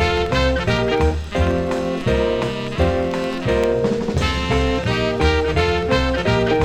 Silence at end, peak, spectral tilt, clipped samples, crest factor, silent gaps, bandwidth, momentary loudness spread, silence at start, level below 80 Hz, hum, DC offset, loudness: 0 s; -4 dBFS; -6 dB/octave; under 0.1%; 14 dB; none; 12 kHz; 3 LU; 0 s; -28 dBFS; none; under 0.1%; -19 LUFS